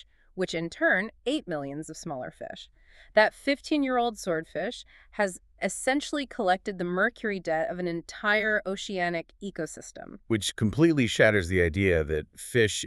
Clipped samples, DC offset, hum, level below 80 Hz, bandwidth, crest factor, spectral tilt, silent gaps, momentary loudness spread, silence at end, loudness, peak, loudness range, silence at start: under 0.1%; under 0.1%; none; -50 dBFS; 13.5 kHz; 22 dB; -4.5 dB/octave; none; 14 LU; 0 s; -27 LUFS; -6 dBFS; 4 LU; 0.35 s